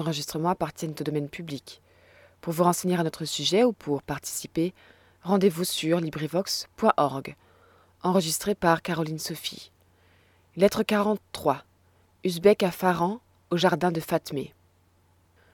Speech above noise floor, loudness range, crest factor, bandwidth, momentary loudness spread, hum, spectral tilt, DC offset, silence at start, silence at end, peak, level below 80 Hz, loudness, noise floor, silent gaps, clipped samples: 37 dB; 3 LU; 22 dB; 19 kHz; 12 LU; none; -5 dB/octave; under 0.1%; 0 s; 1.05 s; -6 dBFS; -60 dBFS; -26 LUFS; -63 dBFS; none; under 0.1%